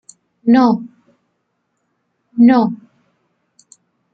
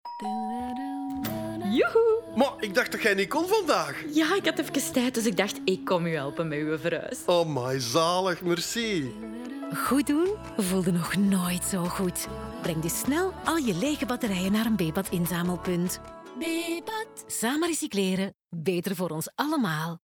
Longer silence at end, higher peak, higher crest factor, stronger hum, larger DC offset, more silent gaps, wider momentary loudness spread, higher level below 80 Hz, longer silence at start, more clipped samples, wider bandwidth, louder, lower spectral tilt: first, 1.4 s vs 0.1 s; first, -2 dBFS vs -10 dBFS; about the same, 16 dB vs 18 dB; neither; neither; neither; first, 20 LU vs 9 LU; second, -62 dBFS vs -54 dBFS; first, 0.45 s vs 0.05 s; neither; second, 8 kHz vs 19.5 kHz; first, -14 LUFS vs -27 LUFS; first, -7 dB/octave vs -4.5 dB/octave